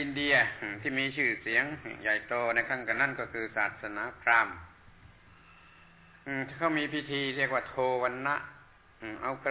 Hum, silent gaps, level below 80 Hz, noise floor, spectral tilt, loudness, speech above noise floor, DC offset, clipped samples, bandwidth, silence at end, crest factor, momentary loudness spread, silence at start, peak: none; none; -62 dBFS; -57 dBFS; -2 dB/octave; -30 LUFS; 26 dB; under 0.1%; under 0.1%; 4 kHz; 0 s; 22 dB; 11 LU; 0 s; -12 dBFS